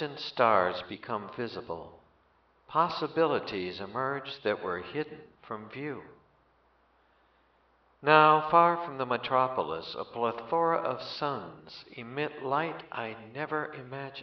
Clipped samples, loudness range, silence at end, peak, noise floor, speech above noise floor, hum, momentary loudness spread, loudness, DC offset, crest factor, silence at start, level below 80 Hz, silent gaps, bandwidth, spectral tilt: under 0.1%; 11 LU; 0 s; -6 dBFS; -67 dBFS; 37 dB; none; 17 LU; -30 LUFS; under 0.1%; 26 dB; 0 s; -70 dBFS; none; 6.4 kHz; -3 dB/octave